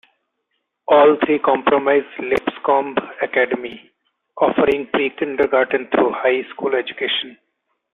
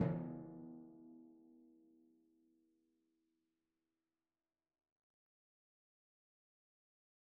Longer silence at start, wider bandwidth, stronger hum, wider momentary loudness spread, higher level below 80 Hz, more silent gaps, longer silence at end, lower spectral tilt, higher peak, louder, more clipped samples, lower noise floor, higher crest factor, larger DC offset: first, 0.9 s vs 0 s; first, 4.3 kHz vs 2.6 kHz; neither; second, 8 LU vs 23 LU; first, -58 dBFS vs -80 dBFS; neither; second, 0.6 s vs 5.45 s; second, -6 dB/octave vs -8.5 dB/octave; first, -2 dBFS vs -22 dBFS; first, -18 LUFS vs -48 LUFS; neither; second, -73 dBFS vs under -90 dBFS; second, 16 dB vs 30 dB; neither